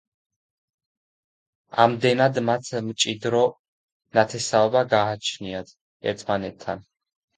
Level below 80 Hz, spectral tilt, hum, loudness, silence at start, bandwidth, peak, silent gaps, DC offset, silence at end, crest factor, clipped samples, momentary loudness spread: -62 dBFS; -4 dB/octave; none; -23 LUFS; 1.75 s; 9.6 kHz; 0 dBFS; 3.59-4.00 s, 5.81-6.00 s; under 0.1%; 0.55 s; 24 dB; under 0.1%; 13 LU